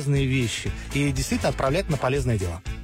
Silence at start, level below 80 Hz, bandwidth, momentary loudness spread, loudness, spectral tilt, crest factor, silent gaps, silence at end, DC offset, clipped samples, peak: 0 s; -36 dBFS; 16 kHz; 5 LU; -25 LUFS; -5.5 dB/octave; 12 dB; none; 0 s; under 0.1%; under 0.1%; -12 dBFS